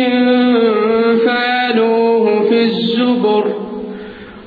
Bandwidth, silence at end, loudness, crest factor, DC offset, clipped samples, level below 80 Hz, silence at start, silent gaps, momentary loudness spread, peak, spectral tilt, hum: 4.9 kHz; 0 s; -13 LUFS; 12 dB; under 0.1%; under 0.1%; -54 dBFS; 0 s; none; 13 LU; -2 dBFS; -8 dB/octave; none